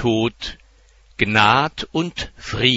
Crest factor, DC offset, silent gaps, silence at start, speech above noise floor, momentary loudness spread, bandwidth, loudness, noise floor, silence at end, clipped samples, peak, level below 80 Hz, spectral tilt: 20 dB; under 0.1%; none; 0 s; 32 dB; 17 LU; 8 kHz; -19 LUFS; -52 dBFS; 0 s; under 0.1%; 0 dBFS; -42 dBFS; -4.5 dB/octave